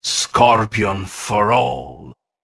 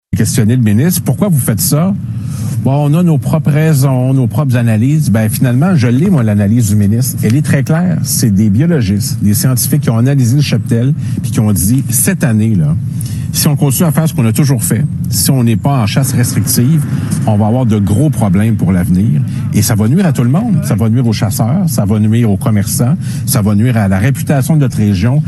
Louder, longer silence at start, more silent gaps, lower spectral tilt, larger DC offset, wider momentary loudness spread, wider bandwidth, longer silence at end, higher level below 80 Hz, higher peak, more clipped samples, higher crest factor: second, -16 LUFS vs -11 LUFS; about the same, 0.05 s vs 0.1 s; neither; second, -3.5 dB/octave vs -6 dB/octave; neither; first, 13 LU vs 3 LU; about the same, 12 kHz vs 13 kHz; first, 0.3 s vs 0 s; second, -46 dBFS vs -38 dBFS; about the same, 0 dBFS vs 0 dBFS; neither; first, 18 dB vs 10 dB